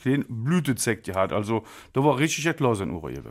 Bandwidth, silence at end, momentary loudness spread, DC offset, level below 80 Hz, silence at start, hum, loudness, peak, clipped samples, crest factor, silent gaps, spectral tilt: 16 kHz; 0 s; 8 LU; under 0.1%; -54 dBFS; 0 s; none; -25 LUFS; -8 dBFS; under 0.1%; 18 dB; none; -5.5 dB/octave